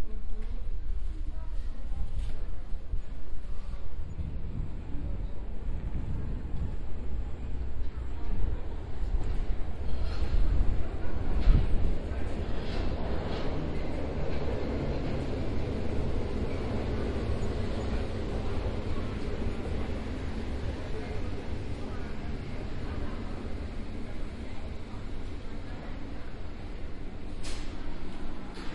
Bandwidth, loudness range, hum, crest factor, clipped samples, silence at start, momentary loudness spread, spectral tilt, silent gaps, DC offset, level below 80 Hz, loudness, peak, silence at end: 8.2 kHz; 8 LU; none; 20 dB; under 0.1%; 0 s; 9 LU; -7.5 dB/octave; none; under 0.1%; -34 dBFS; -36 LUFS; -8 dBFS; 0 s